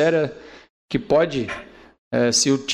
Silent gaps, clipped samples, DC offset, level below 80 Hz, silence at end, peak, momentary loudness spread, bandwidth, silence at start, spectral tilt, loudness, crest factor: 0.70-0.88 s, 1.98-2.11 s; under 0.1%; under 0.1%; -52 dBFS; 0 s; -6 dBFS; 14 LU; 14.5 kHz; 0 s; -3.5 dB/octave; -21 LUFS; 14 dB